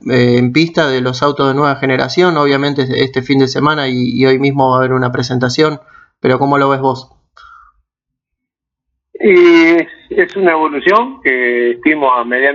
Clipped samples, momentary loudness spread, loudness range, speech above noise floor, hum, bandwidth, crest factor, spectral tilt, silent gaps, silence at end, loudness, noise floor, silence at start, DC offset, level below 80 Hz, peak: under 0.1%; 5 LU; 5 LU; 68 dB; none; 7.6 kHz; 12 dB; -6.5 dB/octave; none; 0 s; -12 LUFS; -80 dBFS; 0.05 s; under 0.1%; -52 dBFS; 0 dBFS